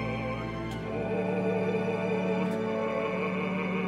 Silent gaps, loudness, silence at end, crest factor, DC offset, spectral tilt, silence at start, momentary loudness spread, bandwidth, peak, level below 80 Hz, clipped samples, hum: none; -30 LUFS; 0 s; 14 dB; under 0.1%; -7.5 dB/octave; 0 s; 5 LU; 11 kHz; -16 dBFS; -52 dBFS; under 0.1%; none